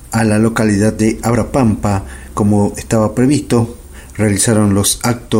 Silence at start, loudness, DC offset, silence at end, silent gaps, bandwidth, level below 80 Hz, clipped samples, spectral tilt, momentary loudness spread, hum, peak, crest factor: 0 s; -14 LUFS; under 0.1%; 0 s; none; 16.5 kHz; -34 dBFS; under 0.1%; -5.5 dB/octave; 7 LU; none; -2 dBFS; 12 dB